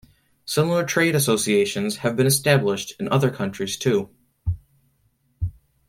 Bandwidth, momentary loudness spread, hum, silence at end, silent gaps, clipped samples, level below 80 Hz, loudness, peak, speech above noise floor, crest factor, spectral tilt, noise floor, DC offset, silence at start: 16.5 kHz; 13 LU; none; 0.4 s; none; under 0.1%; -44 dBFS; -22 LUFS; -2 dBFS; 45 dB; 20 dB; -4.5 dB/octave; -66 dBFS; under 0.1%; 0.45 s